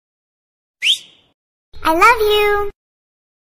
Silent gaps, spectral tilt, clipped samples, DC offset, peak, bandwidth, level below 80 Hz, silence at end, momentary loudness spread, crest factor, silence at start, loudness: 1.34-1.72 s; -2 dB/octave; under 0.1%; under 0.1%; 0 dBFS; 16 kHz; -38 dBFS; 0.75 s; 10 LU; 18 dB; 0.8 s; -14 LUFS